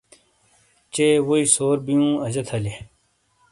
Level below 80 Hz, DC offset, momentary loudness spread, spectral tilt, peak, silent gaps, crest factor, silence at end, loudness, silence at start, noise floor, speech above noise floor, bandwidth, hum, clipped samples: -54 dBFS; under 0.1%; 13 LU; -4.5 dB/octave; -4 dBFS; none; 20 dB; 0.65 s; -20 LUFS; 0.95 s; -65 dBFS; 45 dB; 11.5 kHz; none; under 0.1%